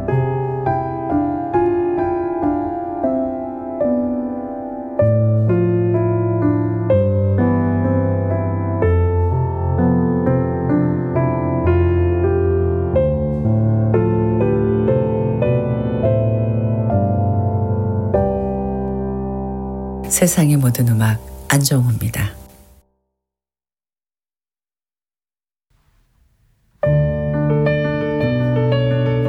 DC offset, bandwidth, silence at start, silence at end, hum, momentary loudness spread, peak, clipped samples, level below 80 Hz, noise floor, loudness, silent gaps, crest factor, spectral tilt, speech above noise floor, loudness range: under 0.1%; 16.5 kHz; 0 s; 0 s; none; 7 LU; -2 dBFS; under 0.1%; -38 dBFS; under -90 dBFS; -18 LUFS; none; 16 dB; -7 dB/octave; over 75 dB; 4 LU